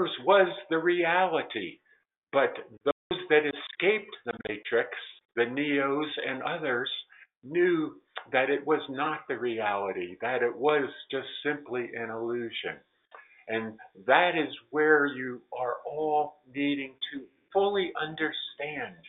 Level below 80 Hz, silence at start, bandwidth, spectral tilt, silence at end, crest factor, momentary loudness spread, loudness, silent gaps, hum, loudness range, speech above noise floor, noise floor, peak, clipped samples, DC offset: -74 dBFS; 0 s; 4.1 kHz; -2 dB/octave; 0 s; 22 dB; 13 LU; -29 LUFS; 2.17-2.22 s, 2.92-3.10 s, 5.25-5.29 s, 7.37-7.41 s; none; 4 LU; 26 dB; -55 dBFS; -6 dBFS; under 0.1%; under 0.1%